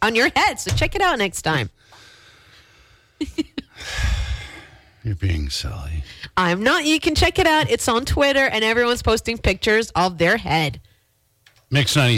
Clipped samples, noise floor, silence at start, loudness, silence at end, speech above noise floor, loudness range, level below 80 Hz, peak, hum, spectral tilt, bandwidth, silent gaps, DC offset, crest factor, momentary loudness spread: under 0.1%; -63 dBFS; 0 s; -19 LUFS; 0 s; 44 dB; 10 LU; -34 dBFS; -8 dBFS; none; -4 dB/octave; 16.5 kHz; none; under 0.1%; 14 dB; 14 LU